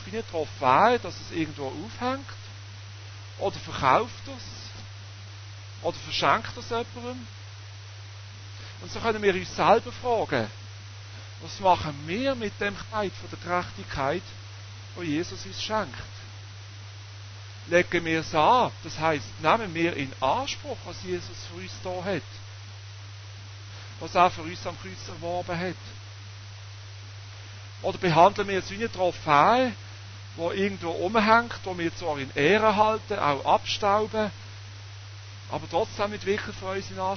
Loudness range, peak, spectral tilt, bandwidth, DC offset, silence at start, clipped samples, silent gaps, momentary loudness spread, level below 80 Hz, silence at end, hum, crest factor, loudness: 8 LU; -6 dBFS; -5 dB/octave; 6.6 kHz; under 0.1%; 0 s; under 0.1%; none; 21 LU; -52 dBFS; 0 s; none; 22 dB; -26 LUFS